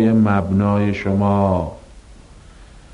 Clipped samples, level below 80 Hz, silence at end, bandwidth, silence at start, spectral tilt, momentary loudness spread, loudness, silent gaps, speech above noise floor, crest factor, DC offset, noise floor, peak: under 0.1%; -42 dBFS; 0.15 s; 9.2 kHz; 0 s; -9 dB/octave; 5 LU; -17 LUFS; none; 26 dB; 16 dB; under 0.1%; -42 dBFS; -2 dBFS